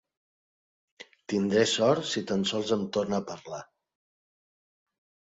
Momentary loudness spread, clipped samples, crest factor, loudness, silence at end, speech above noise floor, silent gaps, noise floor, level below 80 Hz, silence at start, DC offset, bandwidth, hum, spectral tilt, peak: 17 LU; under 0.1%; 20 dB; -27 LUFS; 1.65 s; over 63 dB; none; under -90 dBFS; -68 dBFS; 1 s; under 0.1%; 8.4 kHz; none; -4.5 dB/octave; -10 dBFS